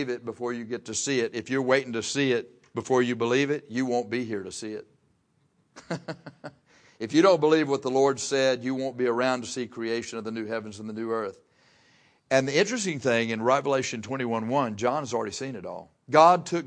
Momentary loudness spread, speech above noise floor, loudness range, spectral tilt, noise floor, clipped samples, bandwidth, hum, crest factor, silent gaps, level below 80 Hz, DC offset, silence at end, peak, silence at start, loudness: 15 LU; 42 dB; 7 LU; -4.5 dB/octave; -68 dBFS; under 0.1%; 10.5 kHz; none; 22 dB; none; -72 dBFS; under 0.1%; 0 s; -6 dBFS; 0 s; -26 LUFS